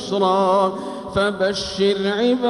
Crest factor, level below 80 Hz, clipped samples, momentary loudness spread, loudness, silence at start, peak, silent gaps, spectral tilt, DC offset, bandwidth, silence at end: 14 dB; -48 dBFS; under 0.1%; 6 LU; -20 LUFS; 0 s; -6 dBFS; none; -5 dB/octave; under 0.1%; 11.5 kHz; 0 s